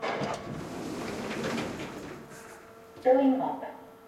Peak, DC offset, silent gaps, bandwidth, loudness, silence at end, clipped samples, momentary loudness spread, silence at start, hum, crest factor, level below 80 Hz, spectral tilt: -12 dBFS; under 0.1%; none; 14.5 kHz; -30 LUFS; 0 s; under 0.1%; 22 LU; 0 s; none; 20 dB; -62 dBFS; -5.5 dB/octave